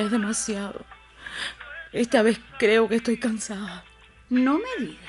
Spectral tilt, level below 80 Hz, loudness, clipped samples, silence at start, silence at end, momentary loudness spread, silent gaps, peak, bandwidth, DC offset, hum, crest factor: -4 dB/octave; -56 dBFS; -24 LUFS; under 0.1%; 0 s; 0 s; 16 LU; none; -6 dBFS; 11.5 kHz; under 0.1%; none; 18 dB